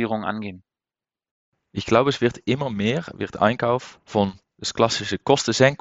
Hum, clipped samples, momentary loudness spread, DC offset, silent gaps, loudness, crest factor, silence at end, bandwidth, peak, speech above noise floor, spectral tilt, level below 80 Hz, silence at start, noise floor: none; under 0.1%; 12 LU; under 0.1%; 1.31-1.52 s; -22 LUFS; 22 dB; 0.05 s; 8.2 kHz; -2 dBFS; over 68 dB; -5 dB/octave; -56 dBFS; 0 s; under -90 dBFS